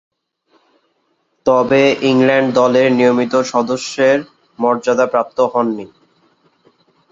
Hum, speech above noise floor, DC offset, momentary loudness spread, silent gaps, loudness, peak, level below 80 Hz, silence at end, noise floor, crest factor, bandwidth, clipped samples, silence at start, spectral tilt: none; 50 dB; under 0.1%; 7 LU; none; -14 LUFS; -2 dBFS; -60 dBFS; 1.25 s; -64 dBFS; 14 dB; 7.8 kHz; under 0.1%; 1.45 s; -5 dB/octave